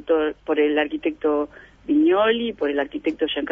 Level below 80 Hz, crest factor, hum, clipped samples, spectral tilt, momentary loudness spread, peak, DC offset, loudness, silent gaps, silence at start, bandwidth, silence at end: -54 dBFS; 14 dB; none; under 0.1%; -6.5 dB/octave; 8 LU; -6 dBFS; under 0.1%; -22 LUFS; none; 0.05 s; 3.7 kHz; 0 s